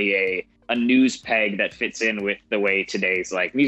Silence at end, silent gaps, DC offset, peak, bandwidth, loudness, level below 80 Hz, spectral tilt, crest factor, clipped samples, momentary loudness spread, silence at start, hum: 0 s; none; under 0.1%; -6 dBFS; 8.4 kHz; -22 LUFS; -62 dBFS; -4 dB/octave; 16 dB; under 0.1%; 6 LU; 0 s; none